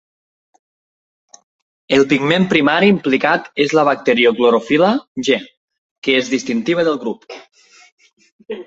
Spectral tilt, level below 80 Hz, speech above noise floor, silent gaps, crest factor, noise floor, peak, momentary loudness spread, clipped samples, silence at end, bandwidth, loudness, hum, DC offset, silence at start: -5 dB/octave; -58 dBFS; over 75 dB; 5.07-5.15 s, 5.57-5.68 s, 5.78-6.02 s, 7.92-7.98 s, 8.32-8.39 s; 16 dB; under -90 dBFS; 0 dBFS; 11 LU; under 0.1%; 0.05 s; 8 kHz; -15 LUFS; none; under 0.1%; 1.9 s